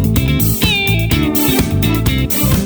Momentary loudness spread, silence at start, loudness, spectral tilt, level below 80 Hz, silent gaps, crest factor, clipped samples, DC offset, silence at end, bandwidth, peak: 2 LU; 0 s; -13 LUFS; -4.5 dB/octave; -22 dBFS; none; 12 dB; under 0.1%; under 0.1%; 0 s; over 20 kHz; -2 dBFS